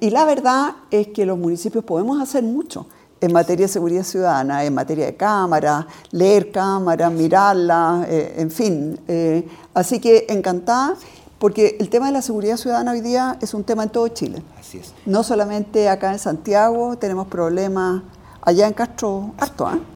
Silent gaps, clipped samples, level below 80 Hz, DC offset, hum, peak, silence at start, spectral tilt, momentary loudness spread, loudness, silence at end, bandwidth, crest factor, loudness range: none; under 0.1%; -54 dBFS; under 0.1%; none; 0 dBFS; 0 s; -5.5 dB/octave; 9 LU; -18 LUFS; 0 s; 17.5 kHz; 18 dB; 4 LU